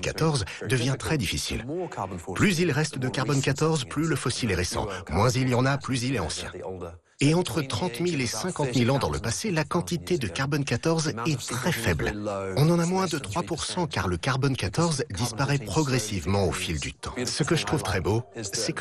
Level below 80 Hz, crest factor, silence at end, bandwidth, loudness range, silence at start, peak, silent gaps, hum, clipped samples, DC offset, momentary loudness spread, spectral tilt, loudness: -46 dBFS; 16 dB; 0 s; 14 kHz; 1 LU; 0 s; -10 dBFS; none; none; under 0.1%; under 0.1%; 7 LU; -5 dB/octave; -26 LUFS